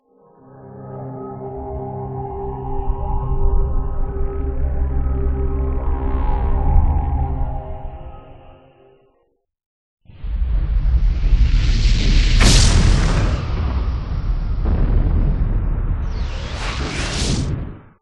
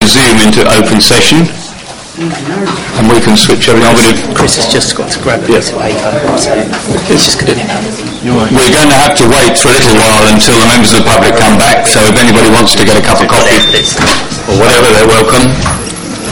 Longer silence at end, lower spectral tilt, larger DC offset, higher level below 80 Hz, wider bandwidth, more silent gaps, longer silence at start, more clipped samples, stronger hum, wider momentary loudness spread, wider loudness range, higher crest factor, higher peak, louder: first, 0.2 s vs 0 s; first, -5 dB/octave vs -3.5 dB/octave; second, under 0.1% vs 10%; first, -18 dBFS vs -26 dBFS; second, 11.5 kHz vs over 20 kHz; first, 9.66-9.97 s vs none; first, 0.55 s vs 0 s; second, under 0.1% vs 4%; neither; first, 13 LU vs 10 LU; first, 11 LU vs 5 LU; first, 18 dB vs 8 dB; about the same, 0 dBFS vs 0 dBFS; second, -21 LUFS vs -6 LUFS